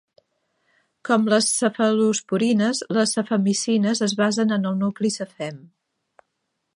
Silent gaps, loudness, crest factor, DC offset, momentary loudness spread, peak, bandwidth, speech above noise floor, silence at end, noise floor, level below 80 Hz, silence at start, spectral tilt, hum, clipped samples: none; -21 LUFS; 18 dB; under 0.1%; 8 LU; -4 dBFS; 11.5 kHz; 56 dB; 1.2 s; -77 dBFS; -72 dBFS; 1.05 s; -4 dB/octave; none; under 0.1%